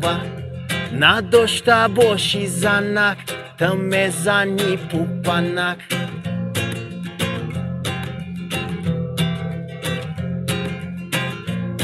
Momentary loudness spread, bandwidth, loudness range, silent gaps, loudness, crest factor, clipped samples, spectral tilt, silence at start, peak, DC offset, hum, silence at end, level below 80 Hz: 12 LU; 16 kHz; 8 LU; none; -20 LUFS; 20 dB; under 0.1%; -4.5 dB/octave; 0 s; 0 dBFS; under 0.1%; none; 0 s; -50 dBFS